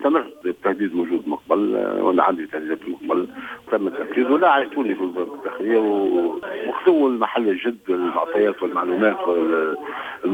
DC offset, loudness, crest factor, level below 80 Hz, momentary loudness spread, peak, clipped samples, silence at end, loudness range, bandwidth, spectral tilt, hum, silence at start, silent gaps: under 0.1%; -21 LUFS; 18 dB; -66 dBFS; 10 LU; -2 dBFS; under 0.1%; 0 s; 2 LU; 8 kHz; -7 dB/octave; none; 0 s; none